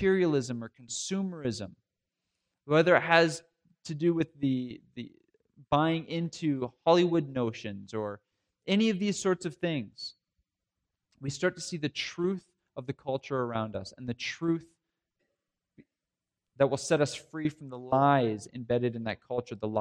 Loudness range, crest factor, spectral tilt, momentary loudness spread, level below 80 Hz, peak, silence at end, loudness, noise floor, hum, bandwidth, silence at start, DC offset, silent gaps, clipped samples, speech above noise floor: 7 LU; 24 dB; -5.5 dB/octave; 17 LU; -66 dBFS; -8 dBFS; 0 s; -30 LUFS; -89 dBFS; none; 11 kHz; 0 s; under 0.1%; none; under 0.1%; 60 dB